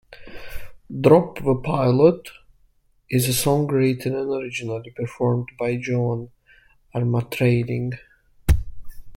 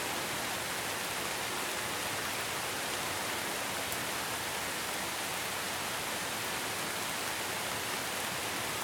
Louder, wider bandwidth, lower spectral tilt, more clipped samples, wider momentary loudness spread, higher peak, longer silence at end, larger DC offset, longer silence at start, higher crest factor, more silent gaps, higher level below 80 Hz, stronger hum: first, -22 LUFS vs -34 LUFS; second, 16.5 kHz vs over 20 kHz; first, -6.5 dB/octave vs -1.5 dB/octave; neither; first, 23 LU vs 1 LU; first, -2 dBFS vs -14 dBFS; about the same, 0 s vs 0 s; neither; about the same, 0.1 s vs 0 s; about the same, 20 dB vs 22 dB; neither; first, -36 dBFS vs -64 dBFS; neither